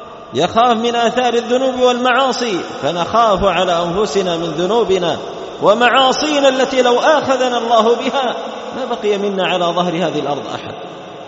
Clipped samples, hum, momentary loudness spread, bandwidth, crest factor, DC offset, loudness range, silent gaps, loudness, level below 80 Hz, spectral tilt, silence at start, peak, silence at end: under 0.1%; none; 11 LU; 8 kHz; 14 dB; under 0.1%; 3 LU; none; -15 LUFS; -46 dBFS; -2.5 dB/octave; 0 s; 0 dBFS; 0 s